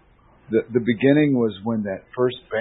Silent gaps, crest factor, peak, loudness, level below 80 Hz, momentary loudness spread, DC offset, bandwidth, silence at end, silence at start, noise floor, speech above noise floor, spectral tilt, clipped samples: none; 18 dB; -4 dBFS; -21 LUFS; -58 dBFS; 9 LU; under 0.1%; 4 kHz; 0 s; 0.5 s; -52 dBFS; 31 dB; -12 dB/octave; under 0.1%